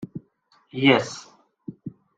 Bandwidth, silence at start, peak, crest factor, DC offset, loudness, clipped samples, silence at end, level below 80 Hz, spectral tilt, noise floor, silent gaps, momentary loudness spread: 9 kHz; 0 s; -4 dBFS; 24 dB; under 0.1%; -21 LUFS; under 0.1%; 0.3 s; -66 dBFS; -5 dB/octave; -63 dBFS; none; 24 LU